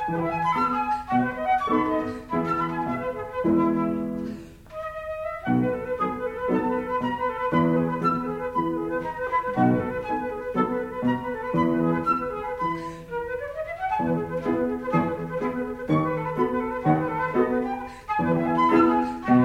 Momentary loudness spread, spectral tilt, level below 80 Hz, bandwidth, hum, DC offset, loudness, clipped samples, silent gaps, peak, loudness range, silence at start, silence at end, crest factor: 9 LU; -8.5 dB/octave; -50 dBFS; 12 kHz; none; under 0.1%; -25 LUFS; under 0.1%; none; -8 dBFS; 3 LU; 0 s; 0 s; 18 dB